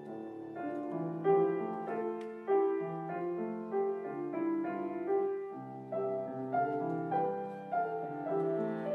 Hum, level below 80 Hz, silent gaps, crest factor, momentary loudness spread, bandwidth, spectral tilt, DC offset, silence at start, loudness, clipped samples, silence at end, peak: none; -86 dBFS; none; 18 dB; 10 LU; 4.1 kHz; -10 dB/octave; under 0.1%; 0 s; -35 LUFS; under 0.1%; 0 s; -18 dBFS